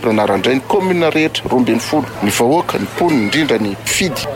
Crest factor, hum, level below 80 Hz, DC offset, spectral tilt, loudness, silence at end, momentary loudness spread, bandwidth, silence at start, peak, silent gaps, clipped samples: 10 dB; none; -44 dBFS; under 0.1%; -4.5 dB/octave; -15 LUFS; 0 s; 3 LU; 17 kHz; 0 s; -4 dBFS; none; under 0.1%